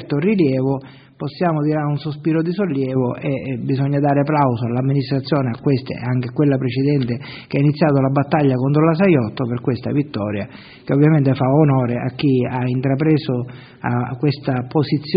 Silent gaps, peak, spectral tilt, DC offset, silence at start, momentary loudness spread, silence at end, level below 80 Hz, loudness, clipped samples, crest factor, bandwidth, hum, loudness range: none; -2 dBFS; -7.5 dB/octave; under 0.1%; 0 s; 8 LU; 0 s; -54 dBFS; -18 LUFS; under 0.1%; 16 dB; 5.2 kHz; none; 3 LU